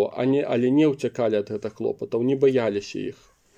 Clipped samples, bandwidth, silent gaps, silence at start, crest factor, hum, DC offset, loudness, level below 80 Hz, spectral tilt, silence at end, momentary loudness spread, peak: under 0.1%; 9 kHz; none; 0 s; 14 dB; none; under 0.1%; -23 LUFS; -66 dBFS; -7 dB/octave; 0.45 s; 11 LU; -8 dBFS